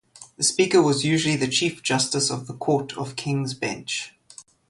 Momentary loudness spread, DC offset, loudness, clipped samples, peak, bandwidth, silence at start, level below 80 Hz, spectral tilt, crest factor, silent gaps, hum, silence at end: 11 LU; under 0.1%; -23 LUFS; under 0.1%; -6 dBFS; 11.5 kHz; 0.2 s; -62 dBFS; -3.5 dB/octave; 18 dB; none; none; 0.3 s